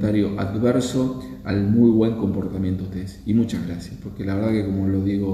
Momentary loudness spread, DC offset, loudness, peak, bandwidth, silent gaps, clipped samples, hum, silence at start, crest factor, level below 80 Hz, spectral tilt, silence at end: 14 LU; under 0.1%; -22 LUFS; -4 dBFS; 13.5 kHz; none; under 0.1%; none; 0 s; 16 dB; -44 dBFS; -7.5 dB/octave; 0 s